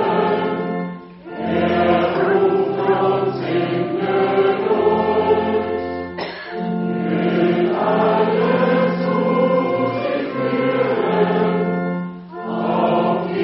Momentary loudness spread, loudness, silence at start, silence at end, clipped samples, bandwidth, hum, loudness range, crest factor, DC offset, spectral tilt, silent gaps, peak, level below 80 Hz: 10 LU; -18 LUFS; 0 s; 0 s; under 0.1%; 5.8 kHz; none; 2 LU; 16 dB; under 0.1%; -5.5 dB/octave; none; -2 dBFS; -56 dBFS